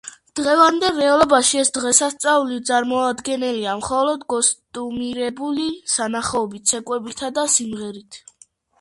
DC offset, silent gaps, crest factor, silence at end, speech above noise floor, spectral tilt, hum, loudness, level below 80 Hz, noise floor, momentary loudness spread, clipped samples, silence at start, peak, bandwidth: under 0.1%; none; 20 dB; 0.6 s; 34 dB; -1.5 dB/octave; none; -19 LUFS; -56 dBFS; -54 dBFS; 12 LU; under 0.1%; 0.05 s; 0 dBFS; 11.5 kHz